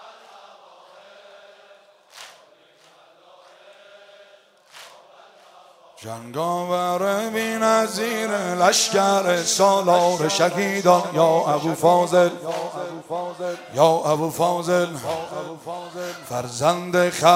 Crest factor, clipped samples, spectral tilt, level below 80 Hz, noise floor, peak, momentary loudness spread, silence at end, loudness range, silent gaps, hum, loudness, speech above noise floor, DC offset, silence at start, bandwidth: 22 dB; under 0.1%; -3.5 dB/octave; -70 dBFS; -54 dBFS; 0 dBFS; 15 LU; 0 s; 9 LU; none; none; -20 LUFS; 33 dB; under 0.1%; 0 s; 16 kHz